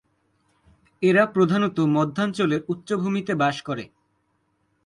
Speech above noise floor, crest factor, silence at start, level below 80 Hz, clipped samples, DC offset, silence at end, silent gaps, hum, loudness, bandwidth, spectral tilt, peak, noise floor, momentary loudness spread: 48 dB; 18 dB; 1 s; -64 dBFS; under 0.1%; under 0.1%; 1 s; none; none; -23 LUFS; 11.5 kHz; -7 dB/octave; -6 dBFS; -70 dBFS; 11 LU